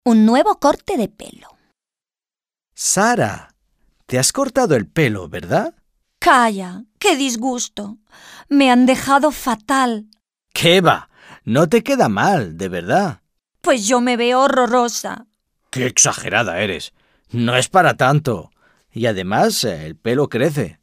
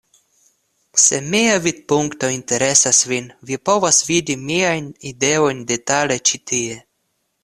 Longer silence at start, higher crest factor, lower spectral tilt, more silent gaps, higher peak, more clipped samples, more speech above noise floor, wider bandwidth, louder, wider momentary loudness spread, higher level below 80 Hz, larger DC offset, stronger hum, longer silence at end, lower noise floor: second, 0.05 s vs 0.95 s; about the same, 16 dB vs 18 dB; first, -4 dB/octave vs -2 dB/octave; neither; about the same, 0 dBFS vs 0 dBFS; neither; first, over 74 dB vs 52 dB; first, 16 kHz vs 14 kHz; about the same, -16 LUFS vs -16 LUFS; about the same, 13 LU vs 11 LU; about the same, -52 dBFS vs -56 dBFS; neither; neither; second, 0.1 s vs 0.65 s; first, under -90 dBFS vs -70 dBFS